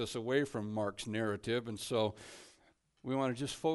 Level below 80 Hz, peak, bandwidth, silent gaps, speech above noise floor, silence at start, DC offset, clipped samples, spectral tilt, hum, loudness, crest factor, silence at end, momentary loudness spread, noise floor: -68 dBFS; -18 dBFS; 11.5 kHz; none; 34 dB; 0 s; under 0.1%; under 0.1%; -5 dB/octave; none; -36 LUFS; 18 dB; 0 s; 15 LU; -70 dBFS